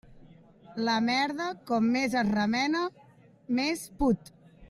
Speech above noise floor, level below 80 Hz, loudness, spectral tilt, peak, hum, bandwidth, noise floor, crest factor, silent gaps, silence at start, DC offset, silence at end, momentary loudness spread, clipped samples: 26 dB; -52 dBFS; -28 LUFS; -4.5 dB/octave; -14 dBFS; none; 13.5 kHz; -54 dBFS; 14 dB; none; 0.1 s; under 0.1%; 0.05 s; 7 LU; under 0.1%